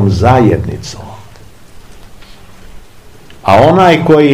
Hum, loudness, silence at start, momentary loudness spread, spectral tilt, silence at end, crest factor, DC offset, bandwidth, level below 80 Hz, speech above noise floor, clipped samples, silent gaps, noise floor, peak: none; -8 LUFS; 0 s; 20 LU; -7 dB/octave; 0 s; 12 dB; 2%; 15.5 kHz; -34 dBFS; 30 dB; 2%; none; -37 dBFS; 0 dBFS